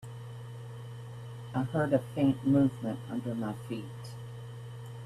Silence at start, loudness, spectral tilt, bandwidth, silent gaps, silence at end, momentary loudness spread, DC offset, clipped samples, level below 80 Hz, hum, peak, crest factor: 0 s; -31 LUFS; -8 dB/octave; 13.5 kHz; none; 0 s; 17 LU; under 0.1%; under 0.1%; -64 dBFS; 60 Hz at -40 dBFS; -14 dBFS; 20 dB